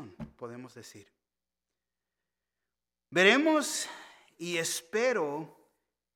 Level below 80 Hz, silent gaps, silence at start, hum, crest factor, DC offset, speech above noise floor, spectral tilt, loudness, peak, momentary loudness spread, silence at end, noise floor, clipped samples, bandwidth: -72 dBFS; none; 0 s; 60 Hz at -70 dBFS; 24 dB; under 0.1%; over 60 dB; -3 dB/octave; -28 LUFS; -8 dBFS; 25 LU; 0.7 s; under -90 dBFS; under 0.1%; 17.5 kHz